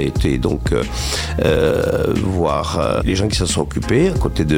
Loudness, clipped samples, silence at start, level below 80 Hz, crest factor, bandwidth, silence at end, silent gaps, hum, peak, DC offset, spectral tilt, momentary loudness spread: -18 LUFS; under 0.1%; 0 s; -26 dBFS; 14 dB; 16.5 kHz; 0 s; none; none; -2 dBFS; 0.3%; -5.5 dB/octave; 4 LU